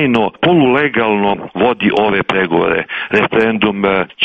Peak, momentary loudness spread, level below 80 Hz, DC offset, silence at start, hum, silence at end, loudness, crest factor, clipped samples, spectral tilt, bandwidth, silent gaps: 0 dBFS; 4 LU; -46 dBFS; under 0.1%; 0 s; none; 0 s; -13 LUFS; 14 dB; under 0.1%; -7.5 dB/octave; 7.6 kHz; none